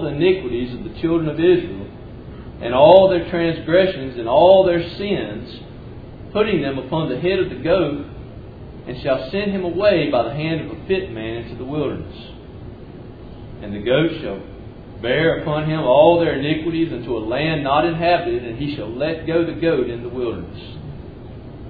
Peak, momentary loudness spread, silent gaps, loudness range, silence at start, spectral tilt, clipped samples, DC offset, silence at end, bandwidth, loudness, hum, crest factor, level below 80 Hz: 0 dBFS; 23 LU; none; 10 LU; 0 s; -9.5 dB/octave; under 0.1%; under 0.1%; 0 s; 4.9 kHz; -19 LUFS; none; 20 dB; -42 dBFS